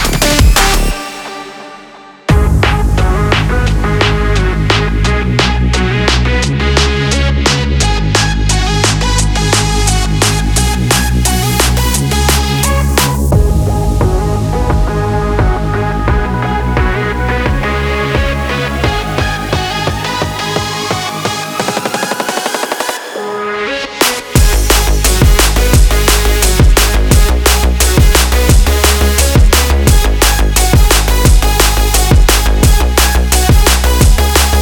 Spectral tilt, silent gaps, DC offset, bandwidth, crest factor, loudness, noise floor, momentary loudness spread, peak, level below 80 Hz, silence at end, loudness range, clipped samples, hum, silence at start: -4 dB/octave; none; under 0.1%; 19.5 kHz; 10 dB; -11 LUFS; -35 dBFS; 7 LU; 0 dBFS; -12 dBFS; 0 s; 5 LU; under 0.1%; none; 0 s